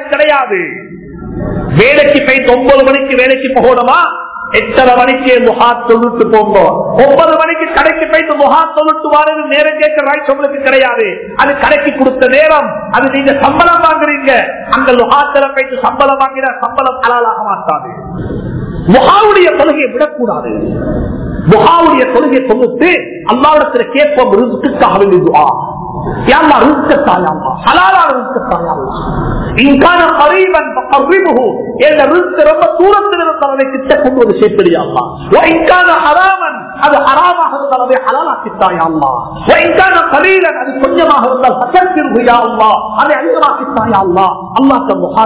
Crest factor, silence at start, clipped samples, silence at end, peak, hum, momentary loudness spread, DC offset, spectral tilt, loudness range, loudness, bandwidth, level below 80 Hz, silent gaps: 8 dB; 0 s; 4%; 0 s; 0 dBFS; none; 8 LU; 0.2%; -9 dB/octave; 2 LU; -8 LUFS; 4 kHz; -34 dBFS; none